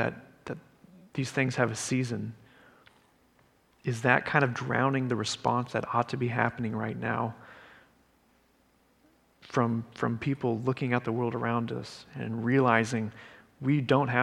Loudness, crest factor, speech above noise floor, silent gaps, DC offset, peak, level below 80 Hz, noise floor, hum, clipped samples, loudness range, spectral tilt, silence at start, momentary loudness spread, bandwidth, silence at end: -29 LUFS; 26 dB; 38 dB; none; under 0.1%; -4 dBFS; -66 dBFS; -66 dBFS; none; under 0.1%; 7 LU; -6 dB/octave; 0 s; 14 LU; 12.5 kHz; 0 s